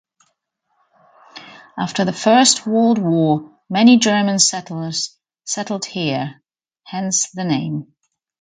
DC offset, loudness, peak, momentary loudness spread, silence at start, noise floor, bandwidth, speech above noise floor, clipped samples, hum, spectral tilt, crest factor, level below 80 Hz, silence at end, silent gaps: under 0.1%; -17 LUFS; 0 dBFS; 17 LU; 1.35 s; -70 dBFS; 9.6 kHz; 53 dB; under 0.1%; none; -3.5 dB/octave; 18 dB; -64 dBFS; 0.6 s; none